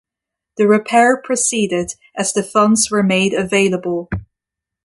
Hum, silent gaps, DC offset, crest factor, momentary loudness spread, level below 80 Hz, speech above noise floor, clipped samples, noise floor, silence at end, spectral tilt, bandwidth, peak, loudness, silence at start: none; none; under 0.1%; 16 dB; 11 LU; -46 dBFS; 69 dB; under 0.1%; -84 dBFS; 0.6 s; -4 dB/octave; 11.5 kHz; -2 dBFS; -15 LUFS; 0.6 s